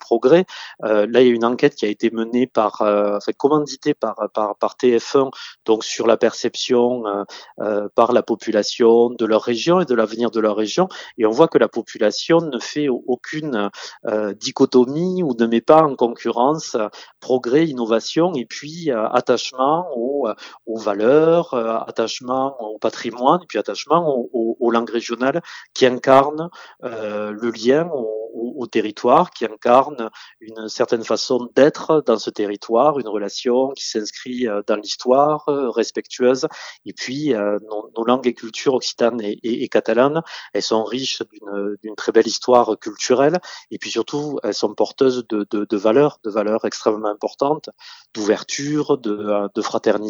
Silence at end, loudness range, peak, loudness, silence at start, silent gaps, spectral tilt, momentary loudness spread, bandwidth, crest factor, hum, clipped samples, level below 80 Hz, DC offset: 0 s; 3 LU; 0 dBFS; -19 LUFS; 0.1 s; none; -5 dB/octave; 11 LU; 19.5 kHz; 18 dB; none; under 0.1%; -70 dBFS; under 0.1%